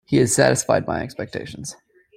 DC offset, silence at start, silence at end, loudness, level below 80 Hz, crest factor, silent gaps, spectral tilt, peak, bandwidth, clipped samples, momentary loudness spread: under 0.1%; 0.1 s; 0.45 s; -20 LUFS; -52 dBFS; 20 dB; none; -4.5 dB/octave; -2 dBFS; 15.5 kHz; under 0.1%; 17 LU